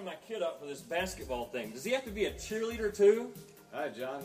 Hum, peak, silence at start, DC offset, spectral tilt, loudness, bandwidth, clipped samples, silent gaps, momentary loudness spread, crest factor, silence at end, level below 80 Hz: none; -14 dBFS; 0 s; under 0.1%; -4 dB/octave; -34 LUFS; 15.5 kHz; under 0.1%; none; 15 LU; 20 dB; 0 s; -56 dBFS